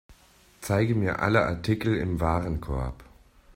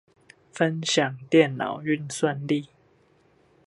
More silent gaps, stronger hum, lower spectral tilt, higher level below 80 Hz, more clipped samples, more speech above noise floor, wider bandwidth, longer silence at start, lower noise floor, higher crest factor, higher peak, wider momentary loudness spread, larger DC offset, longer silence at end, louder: neither; neither; first, -7 dB/octave vs -4.5 dB/octave; first, -42 dBFS vs -70 dBFS; neither; second, 32 dB vs 37 dB; first, 16 kHz vs 11.5 kHz; second, 0.1 s vs 0.55 s; second, -57 dBFS vs -61 dBFS; about the same, 20 dB vs 22 dB; about the same, -8 dBFS vs -6 dBFS; about the same, 9 LU vs 8 LU; neither; second, 0.5 s vs 1 s; about the same, -27 LUFS vs -25 LUFS